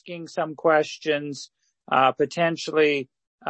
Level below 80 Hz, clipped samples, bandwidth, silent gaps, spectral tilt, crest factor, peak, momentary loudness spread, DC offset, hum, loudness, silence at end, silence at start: -74 dBFS; under 0.1%; 8.6 kHz; 3.27-3.38 s; -4.5 dB/octave; 20 dB; -4 dBFS; 15 LU; under 0.1%; none; -23 LUFS; 0 s; 0.05 s